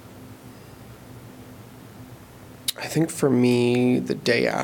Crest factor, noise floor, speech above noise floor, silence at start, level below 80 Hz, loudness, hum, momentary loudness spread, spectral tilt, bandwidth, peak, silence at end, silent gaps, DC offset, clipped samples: 20 dB; -44 dBFS; 24 dB; 0.05 s; -58 dBFS; -22 LUFS; none; 25 LU; -5.5 dB/octave; 18 kHz; -6 dBFS; 0 s; none; under 0.1%; under 0.1%